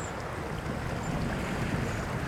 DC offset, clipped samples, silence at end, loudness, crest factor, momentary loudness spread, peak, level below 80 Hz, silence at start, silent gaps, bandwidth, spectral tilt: under 0.1%; under 0.1%; 0 s; -33 LUFS; 14 dB; 4 LU; -18 dBFS; -42 dBFS; 0 s; none; 18 kHz; -6 dB/octave